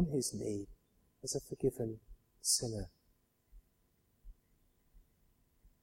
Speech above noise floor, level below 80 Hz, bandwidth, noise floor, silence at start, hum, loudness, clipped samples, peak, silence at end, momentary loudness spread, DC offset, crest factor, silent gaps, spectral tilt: 37 dB; -60 dBFS; 16.5 kHz; -75 dBFS; 0 s; none; -38 LUFS; under 0.1%; -18 dBFS; 0.15 s; 17 LU; under 0.1%; 24 dB; none; -4.5 dB/octave